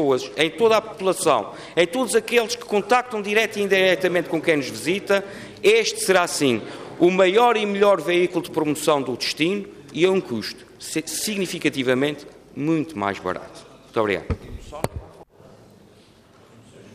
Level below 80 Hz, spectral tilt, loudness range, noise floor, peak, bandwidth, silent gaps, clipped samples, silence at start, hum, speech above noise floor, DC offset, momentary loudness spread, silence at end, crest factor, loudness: -50 dBFS; -4 dB/octave; 8 LU; -51 dBFS; -4 dBFS; 15.5 kHz; none; under 0.1%; 0 s; none; 31 dB; under 0.1%; 13 LU; 0 s; 18 dB; -21 LUFS